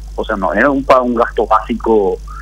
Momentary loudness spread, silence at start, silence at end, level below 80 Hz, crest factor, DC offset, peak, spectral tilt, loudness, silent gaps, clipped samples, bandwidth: 7 LU; 0 s; 0 s; -30 dBFS; 14 dB; under 0.1%; 0 dBFS; -6.5 dB/octave; -14 LUFS; none; under 0.1%; 15 kHz